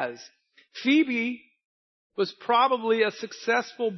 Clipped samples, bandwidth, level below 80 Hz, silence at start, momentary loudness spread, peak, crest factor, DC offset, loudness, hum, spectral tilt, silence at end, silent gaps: under 0.1%; 6.2 kHz; -84 dBFS; 0 s; 18 LU; -8 dBFS; 18 dB; under 0.1%; -25 LUFS; none; -4 dB/octave; 0 s; 1.65-2.10 s